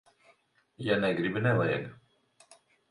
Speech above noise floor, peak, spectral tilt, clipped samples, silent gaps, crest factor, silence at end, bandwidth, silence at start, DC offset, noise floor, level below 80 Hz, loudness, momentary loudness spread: 38 dB; -14 dBFS; -7.5 dB/octave; under 0.1%; none; 20 dB; 0.95 s; 11 kHz; 0.8 s; under 0.1%; -67 dBFS; -64 dBFS; -29 LUFS; 10 LU